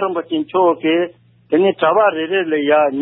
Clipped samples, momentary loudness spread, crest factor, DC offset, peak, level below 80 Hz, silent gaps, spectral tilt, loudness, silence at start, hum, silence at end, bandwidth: under 0.1%; 6 LU; 14 dB; under 0.1%; -2 dBFS; -68 dBFS; none; -10.5 dB/octave; -16 LUFS; 0 s; none; 0 s; 4 kHz